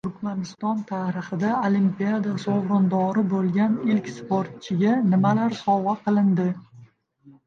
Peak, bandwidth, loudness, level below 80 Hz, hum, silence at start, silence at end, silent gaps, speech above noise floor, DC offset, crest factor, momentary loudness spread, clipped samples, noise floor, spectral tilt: -8 dBFS; 7.2 kHz; -23 LUFS; -66 dBFS; none; 0.05 s; 0.15 s; none; 31 dB; under 0.1%; 14 dB; 8 LU; under 0.1%; -54 dBFS; -8 dB/octave